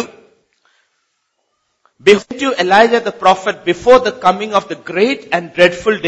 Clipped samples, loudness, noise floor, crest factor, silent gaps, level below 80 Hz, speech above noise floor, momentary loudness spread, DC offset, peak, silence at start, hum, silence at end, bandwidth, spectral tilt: 0.1%; -13 LUFS; -67 dBFS; 14 dB; none; -50 dBFS; 54 dB; 8 LU; under 0.1%; 0 dBFS; 0 s; none; 0 s; 8.6 kHz; -4.5 dB/octave